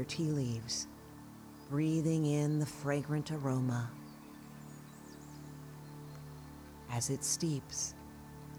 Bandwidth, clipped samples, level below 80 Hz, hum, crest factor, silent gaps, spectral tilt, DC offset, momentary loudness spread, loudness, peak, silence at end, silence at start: over 20 kHz; under 0.1%; -64 dBFS; none; 18 dB; none; -5 dB/octave; under 0.1%; 19 LU; -36 LUFS; -20 dBFS; 0 s; 0 s